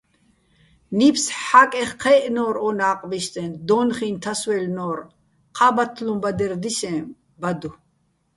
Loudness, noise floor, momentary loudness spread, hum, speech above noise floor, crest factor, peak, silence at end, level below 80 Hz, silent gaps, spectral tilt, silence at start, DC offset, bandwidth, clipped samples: -21 LUFS; -66 dBFS; 13 LU; none; 46 dB; 22 dB; 0 dBFS; 0.65 s; -60 dBFS; none; -4 dB/octave; 0.9 s; under 0.1%; 11.5 kHz; under 0.1%